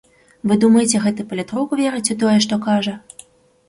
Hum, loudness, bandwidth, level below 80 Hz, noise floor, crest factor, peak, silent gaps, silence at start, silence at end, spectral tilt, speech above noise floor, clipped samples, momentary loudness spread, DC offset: none; -17 LUFS; 11.5 kHz; -58 dBFS; -46 dBFS; 16 dB; -2 dBFS; none; 0.45 s; 0.7 s; -4.5 dB/octave; 29 dB; under 0.1%; 12 LU; under 0.1%